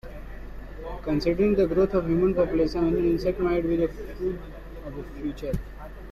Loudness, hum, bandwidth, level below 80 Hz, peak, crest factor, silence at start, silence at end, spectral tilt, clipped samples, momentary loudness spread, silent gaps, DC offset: -25 LUFS; none; 13.5 kHz; -38 dBFS; -10 dBFS; 16 dB; 0.05 s; 0 s; -8.5 dB/octave; under 0.1%; 20 LU; none; under 0.1%